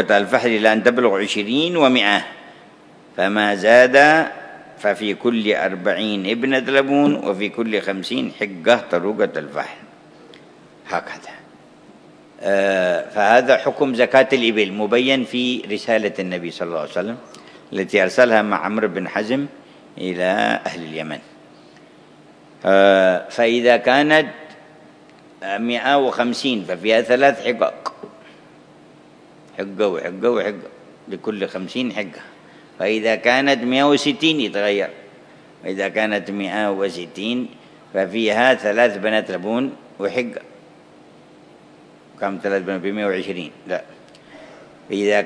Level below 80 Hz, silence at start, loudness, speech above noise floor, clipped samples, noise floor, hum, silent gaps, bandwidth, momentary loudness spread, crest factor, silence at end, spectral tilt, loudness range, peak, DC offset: -70 dBFS; 0 s; -18 LUFS; 29 dB; under 0.1%; -47 dBFS; none; none; 11 kHz; 14 LU; 20 dB; 0 s; -4.5 dB/octave; 9 LU; 0 dBFS; under 0.1%